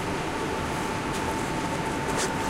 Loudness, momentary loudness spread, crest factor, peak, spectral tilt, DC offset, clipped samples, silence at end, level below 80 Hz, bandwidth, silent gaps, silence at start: -28 LUFS; 2 LU; 16 dB; -12 dBFS; -4 dB/octave; under 0.1%; under 0.1%; 0 s; -44 dBFS; 16 kHz; none; 0 s